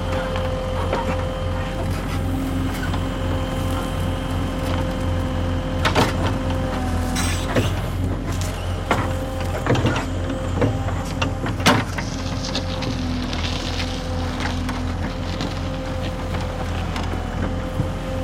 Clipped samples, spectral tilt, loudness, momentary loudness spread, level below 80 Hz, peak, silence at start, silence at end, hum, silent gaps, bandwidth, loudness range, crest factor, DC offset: under 0.1%; -5.5 dB/octave; -24 LUFS; 6 LU; -30 dBFS; -2 dBFS; 0 s; 0 s; none; none; 16.5 kHz; 4 LU; 20 dB; under 0.1%